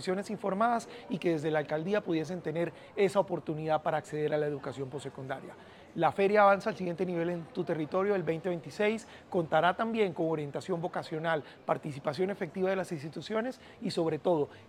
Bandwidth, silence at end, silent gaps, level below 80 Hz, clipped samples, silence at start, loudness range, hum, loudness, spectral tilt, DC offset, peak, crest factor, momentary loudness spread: 14 kHz; 0.05 s; none; -72 dBFS; under 0.1%; 0 s; 4 LU; none; -32 LUFS; -6.5 dB/octave; under 0.1%; -12 dBFS; 20 dB; 11 LU